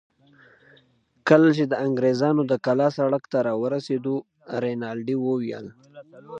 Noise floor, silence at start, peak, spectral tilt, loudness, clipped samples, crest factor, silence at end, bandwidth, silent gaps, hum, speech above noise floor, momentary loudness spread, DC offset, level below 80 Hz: -62 dBFS; 1.25 s; -2 dBFS; -7.5 dB/octave; -23 LUFS; under 0.1%; 22 dB; 0 s; 8 kHz; none; none; 39 dB; 13 LU; under 0.1%; -72 dBFS